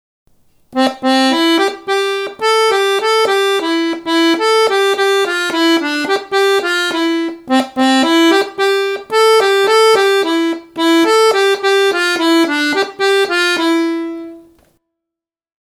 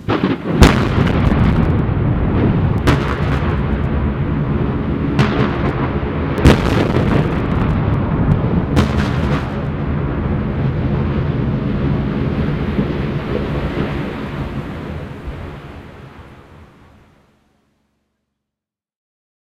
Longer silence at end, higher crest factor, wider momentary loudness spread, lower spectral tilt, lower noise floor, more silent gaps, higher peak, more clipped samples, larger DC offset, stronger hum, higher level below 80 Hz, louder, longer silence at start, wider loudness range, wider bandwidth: second, 1.3 s vs 2.75 s; about the same, 14 dB vs 16 dB; second, 7 LU vs 11 LU; second, -1.5 dB/octave vs -7.5 dB/octave; about the same, -84 dBFS vs -85 dBFS; neither; about the same, 0 dBFS vs 0 dBFS; neither; neither; neither; second, -62 dBFS vs -24 dBFS; first, -13 LUFS vs -17 LUFS; first, 0.7 s vs 0 s; second, 2 LU vs 11 LU; about the same, 15.5 kHz vs 14.5 kHz